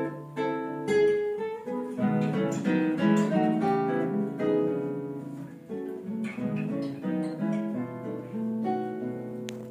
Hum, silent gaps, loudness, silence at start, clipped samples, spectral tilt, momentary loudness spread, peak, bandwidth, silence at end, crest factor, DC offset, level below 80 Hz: none; none; -29 LUFS; 0 s; under 0.1%; -7.5 dB/octave; 12 LU; -12 dBFS; 10.5 kHz; 0 s; 16 dB; under 0.1%; -74 dBFS